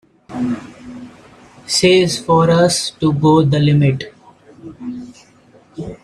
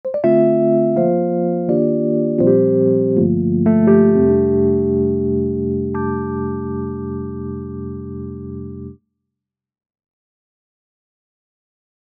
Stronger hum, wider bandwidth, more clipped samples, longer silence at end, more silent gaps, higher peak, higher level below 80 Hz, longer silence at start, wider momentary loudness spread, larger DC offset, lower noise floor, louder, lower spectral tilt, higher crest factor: neither; first, 13.5 kHz vs 2.8 kHz; neither; second, 0.1 s vs 3.25 s; neither; about the same, 0 dBFS vs -2 dBFS; about the same, -48 dBFS vs -44 dBFS; first, 0.3 s vs 0.05 s; first, 22 LU vs 16 LU; neither; second, -48 dBFS vs -82 dBFS; about the same, -14 LUFS vs -16 LUFS; second, -5.5 dB/octave vs -12 dB/octave; about the same, 16 dB vs 16 dB